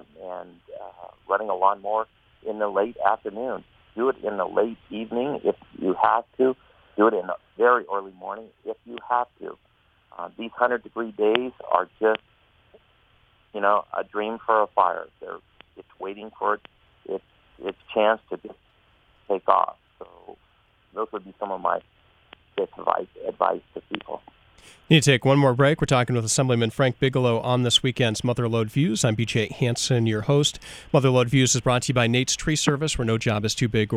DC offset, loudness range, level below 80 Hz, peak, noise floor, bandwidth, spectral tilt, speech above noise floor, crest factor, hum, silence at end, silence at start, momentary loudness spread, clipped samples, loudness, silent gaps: under 0.1%; 8 LU; -52 dBFS; 0 dBFS; -62 dBFS; 15.5 kHz; -4.5 dB/octave; 38 dB; 24 dB; none; 0 s; 0.2 s; 18 LU; under 0.1%; -23 LUFS; none